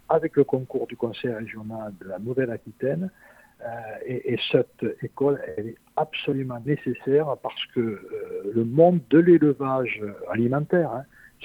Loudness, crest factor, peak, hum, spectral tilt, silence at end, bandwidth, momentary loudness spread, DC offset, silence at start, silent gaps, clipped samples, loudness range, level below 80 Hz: -24 LUFS; 20 dB; -4 dBFS; none; -8.5 dB/octave; 0 s; 5 kHz; 16 LU; under 0.1%; 0.1 s; none; under 0.1%; 9 LU; -64 dBFS